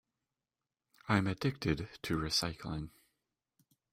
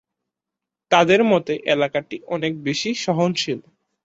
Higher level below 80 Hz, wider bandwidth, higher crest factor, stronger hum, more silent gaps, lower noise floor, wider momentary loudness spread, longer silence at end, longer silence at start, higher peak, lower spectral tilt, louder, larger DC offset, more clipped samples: first, -56 dBFS vs -64 dBFS; first, 16 kHz vs 8 kHz; about the same, 24 dB vs 20 dB; neither; neither; first, under -90 dBFS vs -85 dBFS; about the same, 11 LU vs 11 LU; first, 1.05 s vs 0.45 s; first, 1.05 s vs 0.9 s; second, -14 dBFS vs -2 dBFS; about the same, -5 dB/octave vs -4.5 dB/octave; second, -35 LUFS vs -20 LUFS; neither; neither